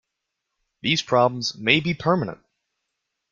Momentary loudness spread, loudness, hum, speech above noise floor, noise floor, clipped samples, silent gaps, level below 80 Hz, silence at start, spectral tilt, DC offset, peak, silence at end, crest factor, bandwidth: 7 LU; -21 LUFS; none; 59 dB; -81 dBFS; under 0.1%; none; -60 dBFS; 0.85 s; -4.5 dB/octave; under 0.1%; 0 dBFS; 1 s; 24 dB; 7.6 kHz